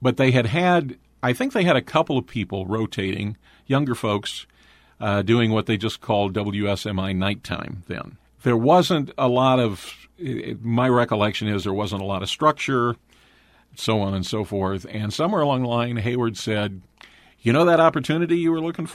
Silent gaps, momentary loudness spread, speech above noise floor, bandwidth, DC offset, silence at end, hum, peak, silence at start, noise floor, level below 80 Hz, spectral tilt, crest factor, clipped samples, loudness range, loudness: none; 12 LU; 35 dB; 15 kHz; under 0.1%; 0 s; none; -2 dBFS; 0 s; -56 dBFS; -54 dBFS; -6 dB/octave; 20 dB; under 0.1%; 3 LU; -22 LUFS